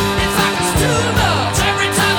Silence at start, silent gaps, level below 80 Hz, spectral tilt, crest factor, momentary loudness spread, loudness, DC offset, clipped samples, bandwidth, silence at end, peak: 0 s; none; -30 dBFS; -3.5 dB/octave; 12 dB; 1 LU; -15 LUFS; under 0.1%; under 0.1%; 19.5 kHz; 0 s; -2 dBFS